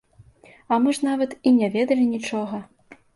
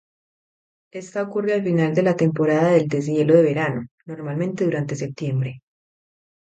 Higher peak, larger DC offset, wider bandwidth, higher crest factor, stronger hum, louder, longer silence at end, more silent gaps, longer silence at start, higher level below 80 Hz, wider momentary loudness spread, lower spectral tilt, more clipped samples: second, -6 dBFS vs -2 dBFS; neither; first, 11.5 kHz vs 8.8 kHz; about the same, 16 dB vs 20 dB; neither; about the same, -22 LUFS vs -21 LUFS; second, 0.2 s vs 0.95 s; second, none vs 3.91-3.98 s; second, 0.7 s vs 0.95 s; about the same, -64 dBFS vs -64 dBFS; second, 9 LU vs 14 LU; second, -5.5 dB/octave vs -7.5 dB/octave; neither